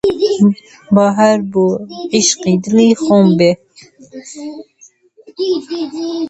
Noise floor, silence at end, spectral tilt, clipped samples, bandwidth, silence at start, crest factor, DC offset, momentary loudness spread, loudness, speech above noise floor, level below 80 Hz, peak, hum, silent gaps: -46 dBFS; 0 s; -5 dB/octave; under 0.1%; 8.2 kHz; 0.05 s; 14 dB; under 0.1%; 18 LU; -13 LUFS; 33 dB; -54 dBFS; 0 dBFS; none; none